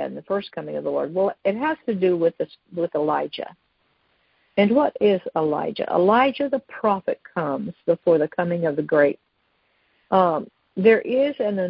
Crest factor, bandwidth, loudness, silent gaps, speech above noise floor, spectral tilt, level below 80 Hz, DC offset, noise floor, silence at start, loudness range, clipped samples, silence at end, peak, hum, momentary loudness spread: 18 dB; 5.4 kHz; -22 LUFS; none; 46 dB; -11 dB/octave; -66 dBFS; under 0.1%; -68 dBFS; 0 s; 3 LU; under 0.1%; 0 s; -4 dBFS; none; 10 LU